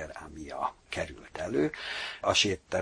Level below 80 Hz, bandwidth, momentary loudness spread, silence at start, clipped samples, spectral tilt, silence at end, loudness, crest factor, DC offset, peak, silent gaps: -56 dBFS; 10.5 kHz; 15 LU; 0 s; under 0.1%; -3 dB/octave; 0 s; -31 LUFS; 22 dB; under 0.1%; -10 dBFS; none